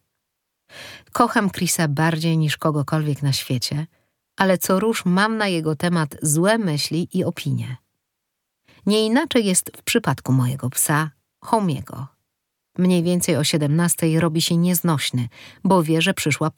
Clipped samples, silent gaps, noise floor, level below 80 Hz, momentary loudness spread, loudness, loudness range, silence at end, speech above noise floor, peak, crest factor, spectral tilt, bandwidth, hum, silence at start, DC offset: under 0.1%; none; -78 dBFS; -60 dBFS; 11 LU; -20 LUFS; 3 LU; 0.05 s; 59 dB; 0 dBFS; 20 dB; -4.5 dB/octave; 19 kHz; none; 0.75 s; under 0.1%